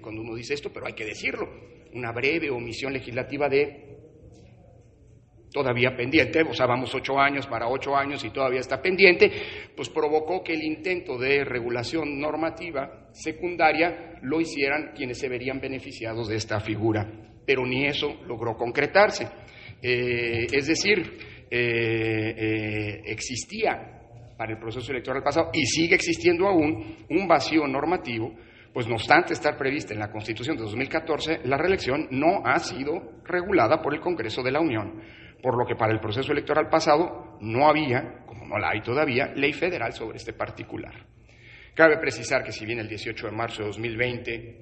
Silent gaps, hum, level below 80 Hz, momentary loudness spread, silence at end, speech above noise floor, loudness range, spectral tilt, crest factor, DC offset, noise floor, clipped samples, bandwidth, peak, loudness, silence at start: none; none; -54 dBFS; 13 LU; 0 s; 28 dB; 5 LU; -5 dB/octave; 24 dB; under 0.1%; -54 dBFS; under 0.1%; 8.8 kHz; -2 dBFS; -25 LUFS; 0 s